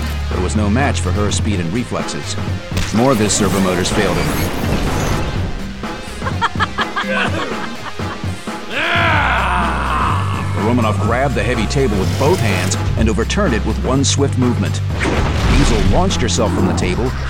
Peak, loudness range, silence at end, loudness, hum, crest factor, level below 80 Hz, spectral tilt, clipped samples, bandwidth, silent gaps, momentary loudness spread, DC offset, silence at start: 0 dBFS; 4 LU; 0 s; -17 LUFS; none; 16 dB; -24 dBFS; -5 dB/octave; under 0.1%; 16.5 kHz; none; 9 LU; 2%; 0 s